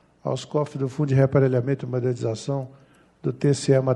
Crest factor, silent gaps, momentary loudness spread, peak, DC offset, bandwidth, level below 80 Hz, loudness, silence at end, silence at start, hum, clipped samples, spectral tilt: 18 dB; none; 11 LU; -6 dBFS; under 0.1%; 10.5 kHz; -58 dBFS; -24 LUFS; 0 s; 0.25 s; none; under 0.1%; -7 dB/octave